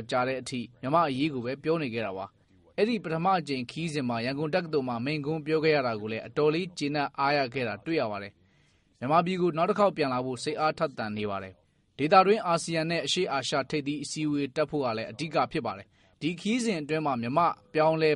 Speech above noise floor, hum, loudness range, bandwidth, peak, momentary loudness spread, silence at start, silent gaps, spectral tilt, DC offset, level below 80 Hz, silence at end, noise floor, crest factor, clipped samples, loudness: 37 dB; none; 3 LU; 11.5 kHz; -6 dBFS; 9 LU; 0 s; none; -5.5 dB/octave; under 0.1%; -66 dBFS; 0 s; -65 dBFS; 22 dB; under 0.1%; -28 LUFS